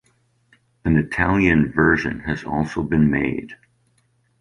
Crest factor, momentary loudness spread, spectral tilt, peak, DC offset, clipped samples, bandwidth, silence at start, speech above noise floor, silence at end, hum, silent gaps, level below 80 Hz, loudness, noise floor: 20 dB; 10 LU; -8 dB/octave; -2 dBFS; under 0.1%; under 0.1%; 10.5 kHz; 0.85 s; 44 dB; 0.85 s; none; none; -38 dBFS; -20 LUFS; -64 dBFS